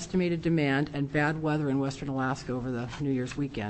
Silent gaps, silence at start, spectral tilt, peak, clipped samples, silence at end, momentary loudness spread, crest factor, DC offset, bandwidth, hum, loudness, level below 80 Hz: none; 0 s; -6.5 dB/octave; -14 dBFS; under 0.1%; 0 s; 6 LU; 16 dB; under 0.1%; 8.6 kHz; none; -29 LUFS; -52 dBFS